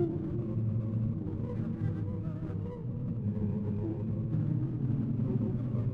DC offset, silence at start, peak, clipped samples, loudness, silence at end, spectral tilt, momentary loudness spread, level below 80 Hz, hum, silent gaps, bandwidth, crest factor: under 0.1%; 0 s; -18 dBFS; under 0.1%; -34 LUFS; 0 s; -12 dB/octave; 5 LU; -50 dBFS; none; none; 3.4 kHz; 14 dB